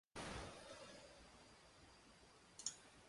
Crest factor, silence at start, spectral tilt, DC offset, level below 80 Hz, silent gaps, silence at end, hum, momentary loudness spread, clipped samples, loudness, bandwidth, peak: 30 dB; 0.15 s; -2.5 dB/octave; under 0.1%; -70 dBFS; none; 0 s; none; 15 LU; under 0.1%; -55 LUFS; 11.5 kHz; -28 dBFS